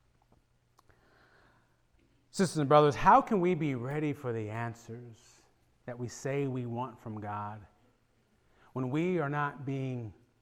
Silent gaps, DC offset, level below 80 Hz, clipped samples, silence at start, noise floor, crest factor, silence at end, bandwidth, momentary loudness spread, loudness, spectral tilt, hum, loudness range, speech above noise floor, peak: none; under 0.1%; -58 dBFS; under 0.1%; 2.35 s; -70 dBFS; 24 dB; 0.3 s; 16 kHz; 21 LU; -31 LUFS; -6.5 dB/octave; none; 11 LU; 40 dB; -10 dBFS